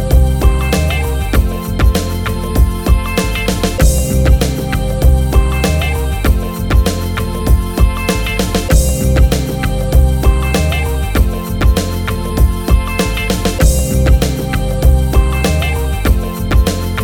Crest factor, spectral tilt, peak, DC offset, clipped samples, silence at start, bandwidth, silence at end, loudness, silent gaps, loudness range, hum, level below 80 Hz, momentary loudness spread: 12 dB; -5.5 dB/octave; 0 dBFS; under 0.1%; under 0.1%; 0 s; 17.5 kHz; 0 s; -14 LUFS; none; 1 LU; none; -14 dBFS; 5 LU